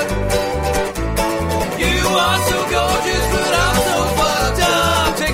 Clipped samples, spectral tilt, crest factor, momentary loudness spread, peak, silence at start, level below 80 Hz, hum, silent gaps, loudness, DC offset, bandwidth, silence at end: under 0.1%; -3.5 dB/octave; 16 dB; 5 LU; -2 dBFS; 0 s; -26 dBFS; none; none; -16 LUFS; under 0.1%; 16.5 kHz; 0 s